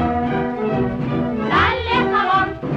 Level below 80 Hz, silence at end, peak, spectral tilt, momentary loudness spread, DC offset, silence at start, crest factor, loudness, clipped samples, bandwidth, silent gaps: -38 dBFS; 0 s; -6 dBFS; -7.5 dB/octave; 5 LU; under 0.1%; 0 s; 14 dB; -19 LUFS; under 0.1%; 7.6 kHz; none